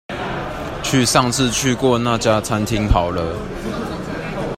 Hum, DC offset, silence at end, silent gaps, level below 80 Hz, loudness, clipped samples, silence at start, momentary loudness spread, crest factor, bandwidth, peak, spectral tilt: none; under 0.1%; 0 s; none; -32 dBFS; -19 LUFS; under 0.1%; 0.1 s; 11 LU; 18 dB; 16 kHz; 0 dBFS; -4.5 dB/octave